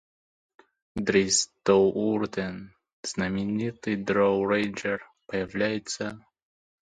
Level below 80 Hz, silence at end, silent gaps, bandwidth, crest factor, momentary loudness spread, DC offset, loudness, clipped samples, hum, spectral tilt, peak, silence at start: -58 dBFS; 0.7 s; 2.93-3.03 s; 9.6 kHz; 20 dB; 13 LU; under 0.1%; -27 LUFS; under 0.1%; none; -4 dB/octave; -8 dBFS; 0.95 s